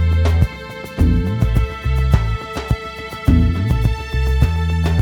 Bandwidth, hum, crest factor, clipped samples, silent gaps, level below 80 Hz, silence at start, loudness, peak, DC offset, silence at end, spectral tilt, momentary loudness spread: 15 kHz; none; 16 dB; under 0.1%; none; -20 dBFS; 0 s; -18 LUFS; 0 dBFS; under 0.1%; 0 s; -7.5 dB/octave; 7 LU